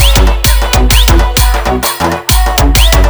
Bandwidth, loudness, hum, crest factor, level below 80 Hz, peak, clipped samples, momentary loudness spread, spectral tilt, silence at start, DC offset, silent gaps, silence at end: over 20 kHz; -9 LUFS; none; 8 dB; -10 dBFS; 0 dBFS; 1%; 4 LU; -3.5 dB/octave; 0 s; under 0.1%; none; 0 s